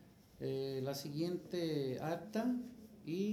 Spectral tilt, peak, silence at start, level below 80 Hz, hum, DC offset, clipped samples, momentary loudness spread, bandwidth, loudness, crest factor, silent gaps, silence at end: -6.5 dB/octave; -26 dBFS; 0 s; -74 dBFS; none; under 0.1%; under 0.1%; 7 LU; 19 kHz; -41 LUFS; 14 dB; none; 0 s